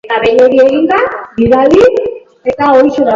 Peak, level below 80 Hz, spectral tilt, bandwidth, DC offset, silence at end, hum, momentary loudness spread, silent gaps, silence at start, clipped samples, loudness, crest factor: 0 dBFS; -38 dBFS; -6.5 dB/octave; 7.4 kHz; under 0.1%; 0 s; none; 10 LU; none; 0.05 s; 0.2%; -9 LUFS; 8 dB